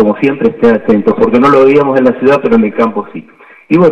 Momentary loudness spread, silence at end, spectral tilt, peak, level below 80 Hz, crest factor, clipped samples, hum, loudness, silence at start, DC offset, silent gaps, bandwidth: 8 LU; 0 s; -8.5 dB/octave; 0 dBFS; -44 dBFS; 8 dB; under 0.1%; none; -9 LUFS; 0 s; under 0.1%; none; 8 kHz